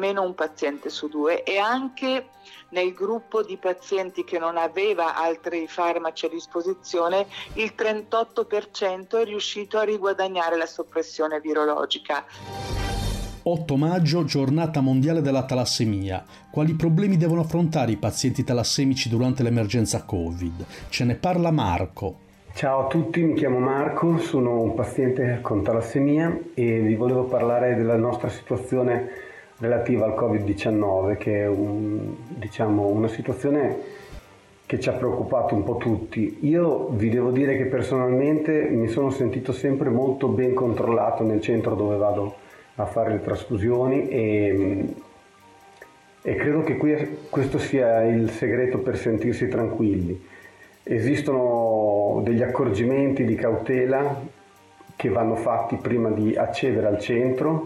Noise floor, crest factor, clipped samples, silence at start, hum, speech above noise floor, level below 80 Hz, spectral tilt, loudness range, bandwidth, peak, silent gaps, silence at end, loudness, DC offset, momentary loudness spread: -51 dBFS; 10 dB; under 0.1%; 0 s; none; 29 dB; -48 dBFS; -6.5 dB/octave; 3 LU; 14.5 kHz; -12 dBFS; none; 0 s; -24 LUFS; under 0.1%; 8 LU